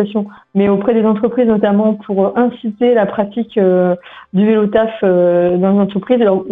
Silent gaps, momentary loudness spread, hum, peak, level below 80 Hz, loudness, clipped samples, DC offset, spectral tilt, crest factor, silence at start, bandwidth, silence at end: none; 6 LU; none; -2 dBFS; -52 dBFS; -14 LUFS; under 0.1%; under 0.1%; -10.5 dB/octave; 12 dB; 0 s; 3.9 kHz; 0 s